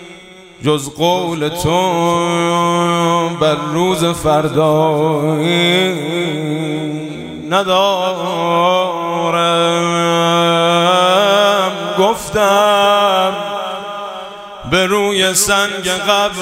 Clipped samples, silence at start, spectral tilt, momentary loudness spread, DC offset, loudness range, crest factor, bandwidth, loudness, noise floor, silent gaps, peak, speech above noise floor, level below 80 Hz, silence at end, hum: under 0.1%; 0 s; -4 dB/octave; 10 LU; under 0.1%; 3 LU; 14 dB; 16 kHz; -14 LUFS; -37 dBFS; none; 0 dBFS; 23 dB; -46 dBFS; 0 s; none